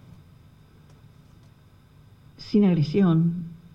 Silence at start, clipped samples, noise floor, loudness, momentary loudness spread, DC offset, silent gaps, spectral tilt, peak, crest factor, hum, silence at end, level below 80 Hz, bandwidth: 2.4 s; under 0.1%; -53 dBFS; -22 LUFS; 13 LU; under 0.1%; none; -9.5 dB/octave; -10 dBFS; 16 dB; 50 Hz at -45 dBFS; 0.2 s; -56 dBFS; 6.6 kHz